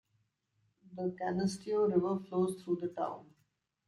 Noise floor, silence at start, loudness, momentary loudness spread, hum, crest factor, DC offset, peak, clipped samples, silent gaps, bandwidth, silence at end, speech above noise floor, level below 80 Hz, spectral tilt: -78 dBFS; 0.9 s; -35 LUFS; 9 LU; none; 18 dB; under 0.1%; -18 dBFS; under 0.1%; none; 12 kHz; 0.65 s; 44 dB; -72 dBFS; -7 dB/octave